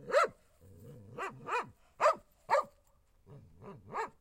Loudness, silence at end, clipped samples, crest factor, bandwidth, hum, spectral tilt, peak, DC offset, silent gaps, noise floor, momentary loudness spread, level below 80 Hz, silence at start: -34 LUFS; 0.1 s; under 0.1%; 22 dB; 16 kHz; none; -3.5 dB/octave; -14 dBFS; under 0.1%; none; -68 dBFS; 23 LU; -70 dBFS; 0 s